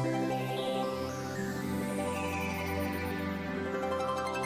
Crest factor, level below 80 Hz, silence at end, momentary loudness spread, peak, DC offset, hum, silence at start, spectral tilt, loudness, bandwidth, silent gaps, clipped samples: 12 dB; -50 dBFS; 0 s; 3 LU; -22 dBFS; under 0.1%; none; 0 s; -5.5 dB/octave; -34 LUFS; 16 kHz; none; under 0.1%